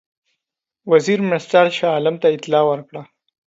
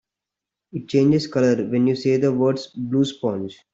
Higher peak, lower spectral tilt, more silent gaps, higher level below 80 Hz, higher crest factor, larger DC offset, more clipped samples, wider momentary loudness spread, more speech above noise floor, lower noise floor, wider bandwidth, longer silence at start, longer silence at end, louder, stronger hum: first, 0 dBFS vs -6 dBFS; second, -5.5 dB/octave vs -7 dB/octave; neither; second, -70 dBFS vs -60 dBFS; about the same, 18 dB vs 14 dB; neither; neither; first, 17 LU vs 10 LU; about the same, 65 dB vs 66 dB; second, -82 dBFS vs -86 dBFS; about the same, 8 kHz vs 7.8 kHz; about the same, 0.85 s vs 0.75 s; first, 0.45 s vs 0.2 s; first, -17 LUFS vs -21 LUFS; neither